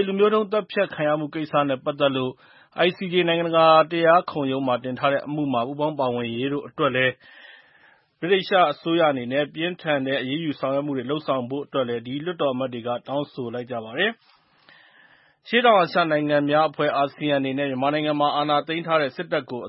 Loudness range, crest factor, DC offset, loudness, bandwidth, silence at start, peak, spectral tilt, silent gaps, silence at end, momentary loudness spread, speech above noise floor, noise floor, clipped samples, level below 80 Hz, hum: 6 LU; 20 dB; under 0.1%; -23 LUFS; 5.8 kHz; 0 s; -4 dBFS; -10 dB/octave; none; 0 s; 10 LU; 35 dB; -57 dBFS; under 0.1%; -70 dBFS; none